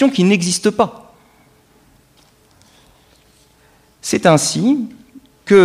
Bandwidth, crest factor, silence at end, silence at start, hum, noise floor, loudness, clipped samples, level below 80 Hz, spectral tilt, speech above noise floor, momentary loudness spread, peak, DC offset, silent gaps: 15 kHz; 18 dB; 0 s; 0 s; none; -52 dBFS; -15 LUFS; under 0.1%; -56 dBFS; -4.5 dB/octave; 38 dB; 14 LU; 0 dBFS; under 0.1%; none